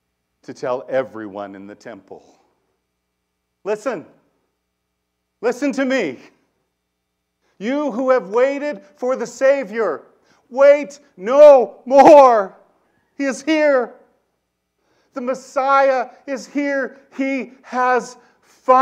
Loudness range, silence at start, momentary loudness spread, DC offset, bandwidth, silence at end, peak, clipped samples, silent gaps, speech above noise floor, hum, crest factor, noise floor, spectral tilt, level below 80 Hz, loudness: 17 LU; 0.5 s; 21 LU; under 0.1%; 9.4 kHz; 0 s; 0 dBFS; under 0.1%; none; 58 dB; none; 18 dB; -74 dBFS; -4.5 dB/octave; -68 dBFS; -16 LUFS